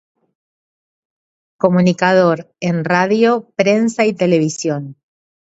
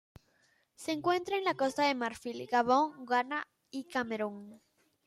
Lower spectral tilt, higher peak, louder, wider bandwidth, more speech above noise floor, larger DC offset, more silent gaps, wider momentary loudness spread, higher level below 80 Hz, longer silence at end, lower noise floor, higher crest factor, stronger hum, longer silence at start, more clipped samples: first, -6 dB/octave vs -4 dB/octave; first, 0 dBFS vs -14 dBFS; first, -15 LUFS vs -32 LUFS; second, 8 kHz vs 14 kHz; first, over 76 dB vs 39 dB; neither; neither; second, 8 LU vs 13 LU; first, -64 dBFS vs -74 dBFS; first, 0.65 s vs 0.5 s; first, under -90 dBFS vs -71 dBFS; about the same, 16 dB vs 18 dB; neither; first, 1.65 s vs 0.8 s; neither